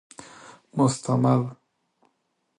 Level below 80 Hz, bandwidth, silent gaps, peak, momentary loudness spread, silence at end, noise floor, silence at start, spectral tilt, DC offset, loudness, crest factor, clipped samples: -66 dBFS; 11 kHz; none; -8 dBFS; 23 LU; 1.05 s; -74 dBFS; 0.5 s; -7 dB/octave; under 0.1%; -24 LUFS; 20 dB; under 0.1%